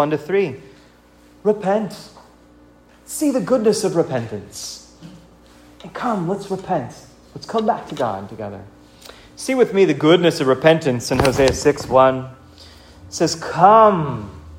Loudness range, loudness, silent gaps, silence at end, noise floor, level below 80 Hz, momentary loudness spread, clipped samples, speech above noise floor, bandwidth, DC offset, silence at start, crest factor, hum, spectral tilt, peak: 9 LU; -18 LUFS; none; 0 s; -49 dBFS; -46 dBFS; 18 LU; under 0.1%; 32 dB; 16 kHz; under 0.1%; 0 s; 18 dB; none; -5 dB/octave; 0 dBFS